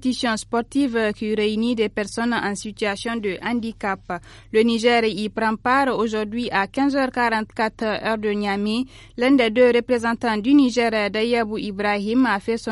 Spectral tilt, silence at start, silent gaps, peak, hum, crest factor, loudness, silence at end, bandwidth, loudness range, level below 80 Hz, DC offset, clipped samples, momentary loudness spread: -4.5 dB/octave; 0 s; none; -4 dBFS; none; 16 dB; -21 LUFS; 0 s; 11.5 kHz; 4 LU; -50 dBFS; under 0.1%; under 0.1%; 8 LU